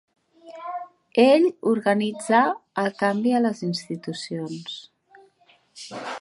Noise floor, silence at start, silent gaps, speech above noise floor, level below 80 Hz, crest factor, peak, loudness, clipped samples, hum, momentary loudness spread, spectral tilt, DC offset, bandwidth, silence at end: -60 dBFS; 0.45 s; none; 37 dB; -76 dBFS; 20 dB; -4 dBFS; -22 LUFS; under 0.1%; none; 18 LU; -5.5 dB/octave; under 0.1%; 11.5 kHz; 0 s